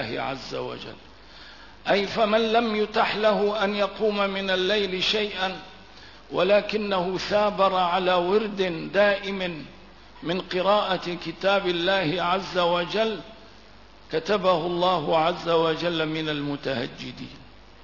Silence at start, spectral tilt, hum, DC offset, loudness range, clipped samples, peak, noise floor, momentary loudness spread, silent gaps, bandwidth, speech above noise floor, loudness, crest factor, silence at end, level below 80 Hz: 0 s; -5 dB/octave; none; 0.2%; 2 LU; under 0.1%; -8 dBFS; -50 dBFS; 13 LU; none; 6 kHz; 26 dB; -24 LUFS; 16 dB; 0.4 s; -54 dBFS